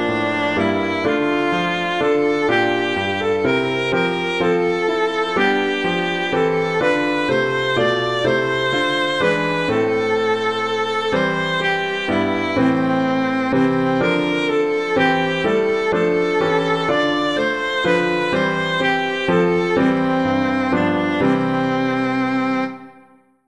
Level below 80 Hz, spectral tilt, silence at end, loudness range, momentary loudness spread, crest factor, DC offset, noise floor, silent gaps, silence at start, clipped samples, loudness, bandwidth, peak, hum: -52 dBFS; -5.5 dB/octave; 0.55 s; 1 LU; 2 LU; 14 dB; 0.4%; -51 dBFS; none; 0 s; under 0.1%; -18 LUFS; 11 kHz; -4 dBFS; none